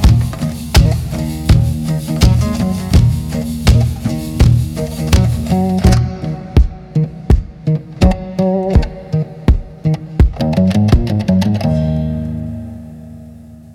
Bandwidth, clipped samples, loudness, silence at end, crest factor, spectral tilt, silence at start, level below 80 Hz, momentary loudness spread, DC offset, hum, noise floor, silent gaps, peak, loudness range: 16.5 kHz; under 0.1%; -15 LUFS; 0 s; 14 dB; -7 dB/octave; 0 s; -20 dBFS; 8 LU; under 0.1%; none; -35 dBFS; none; 0 dBFS; 2 LU